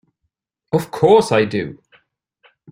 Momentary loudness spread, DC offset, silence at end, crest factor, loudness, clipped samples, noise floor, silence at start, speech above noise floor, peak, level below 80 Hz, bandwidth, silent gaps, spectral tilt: 12 LU; under 0.1%; 0.95 s; 18 dB; -16 LUFS; under 0.1%; -75 dBFS; 0.75 s; 59 dB; 0 dBFS; -56 dBFS; 16 kHz; none; -6 dB/octave